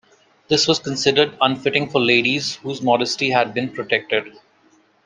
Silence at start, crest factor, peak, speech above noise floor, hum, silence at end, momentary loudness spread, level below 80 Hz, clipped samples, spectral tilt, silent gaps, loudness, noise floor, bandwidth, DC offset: 0.5 s; 20 dB; 0 dBFS; 38 dB; none; 0.75 s; 7 LU; -62 dBFS; under 0.1%; -3.5 dB/octave; none; -18 LUFS; -57 dBFS; 9.8 kHz; under 0.1%